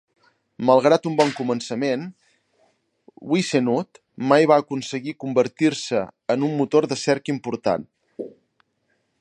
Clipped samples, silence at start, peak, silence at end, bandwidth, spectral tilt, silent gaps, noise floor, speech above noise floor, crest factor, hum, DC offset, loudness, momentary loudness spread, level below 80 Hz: under 0.1%; 0.6 s; -2 dBFS; 0.9 s; 11 kHz; -5.5 dB/octave; none; -70 dBFS; 49 dB; 20 dB; none; under 0.1%; -21 LUFS; 19 LU; -68 dBFS